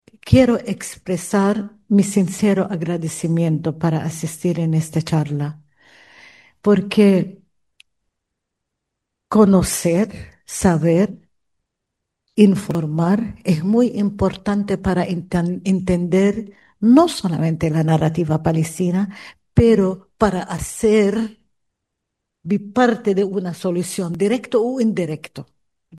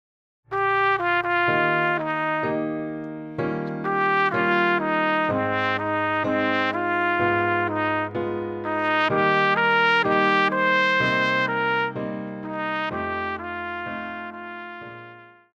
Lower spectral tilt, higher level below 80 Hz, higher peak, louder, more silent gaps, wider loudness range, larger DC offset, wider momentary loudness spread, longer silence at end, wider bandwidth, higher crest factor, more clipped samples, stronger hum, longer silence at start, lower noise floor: about the same, -6.5 dB/octave vs -6 dB/octave; first, -44 dBFS vs -60 dBFS; first, 0 dBFS vs -8 dBFS; first, -18 LUFS vs -22 LUFS; neither; about the same, 4 LU vs 6 LU; neither; about the same, 11 LU vs 13 LU; second, 0 s vs 0.25 s; first, 12.5 kHz vs 8.6 kHz; about the same, 18 dB vs 16 dB; neither; neither; second, 0.25 s vs 0.5 s; first, -79 dBFS vs -46 dBFS